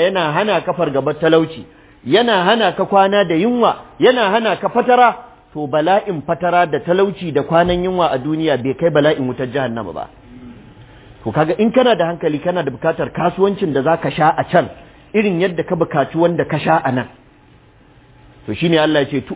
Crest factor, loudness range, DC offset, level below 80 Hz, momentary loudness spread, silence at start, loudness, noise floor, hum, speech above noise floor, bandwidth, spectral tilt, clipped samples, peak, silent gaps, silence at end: 16 dB; 4 LU; under 0.1%; -46 dBFS; 9 LU; 0 s; -16 LUFS; -47 dBFS; none; 32 dB; 4 kHz; -10 dB/octave; under 0.1%; 0 dBFS; none; 0 s